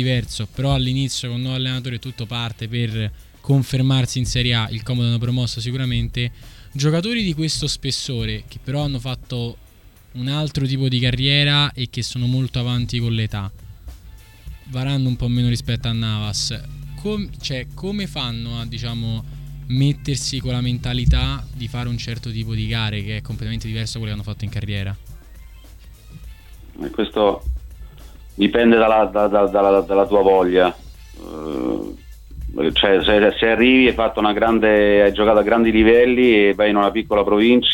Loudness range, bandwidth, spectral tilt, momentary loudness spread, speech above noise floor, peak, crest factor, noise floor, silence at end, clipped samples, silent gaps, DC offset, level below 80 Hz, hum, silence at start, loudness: 11 LU; 17 kHz; -5.5 dB/octave; 15 LU; 28 dB; -2 dBFS; 18 dB; -46 dBFS; 0 s; under 0.1%; none; under 0.1%; -34 dBFS; none; 0 s; -19 LUFS